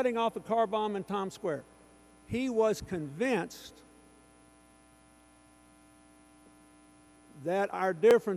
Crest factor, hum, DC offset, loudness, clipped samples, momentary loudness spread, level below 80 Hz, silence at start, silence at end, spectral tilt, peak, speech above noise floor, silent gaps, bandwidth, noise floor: 20 dB; 60 Hz at -65 dBFS; under 0.1%; -31 LUFS; under 0.1%; 14 LU; -64 dBFS; 0 s; 0 s; -5.5 dB/octave; -14 dBFS; 30 dB; none; 14 kHz; -60 dBFS